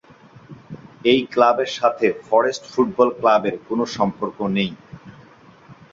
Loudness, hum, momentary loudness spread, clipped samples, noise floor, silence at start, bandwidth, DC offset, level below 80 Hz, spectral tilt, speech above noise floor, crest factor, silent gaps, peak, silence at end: -19 LUFS; none; 10 LU; under 0.1%; -47 dBFS; 0.5 s; 7.8 kHz; under 0.1%; -60 dBFS; -5.5 dB/octave; 29 dB; 18 dB; none; -2 dBFS; 0.2 s